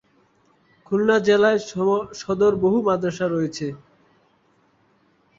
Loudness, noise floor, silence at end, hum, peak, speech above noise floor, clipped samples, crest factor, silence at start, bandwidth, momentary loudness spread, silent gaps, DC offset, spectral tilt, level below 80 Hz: -21 LUFS; -62 dBFS; 1.6 s; none; -4 dBFS; 42 dB; under 0.1%; 18 dB; 0.9 s; 7.6 kHz; 11 LU; none; under 0.1%; -6 dB/octave; -58 dBFS